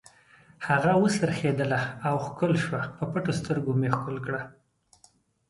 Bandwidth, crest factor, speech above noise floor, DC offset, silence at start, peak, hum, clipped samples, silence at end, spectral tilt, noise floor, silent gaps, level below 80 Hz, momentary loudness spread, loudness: 11.5 kHz; 22 dB; 36 dB; under 0.1%; 0.6 s; -6 dBFS; none; under 0.1%; 1 s; -6.5 dB/octave; -62 dBFS; none; -60 dBFS; 10 LU; -27 LUFS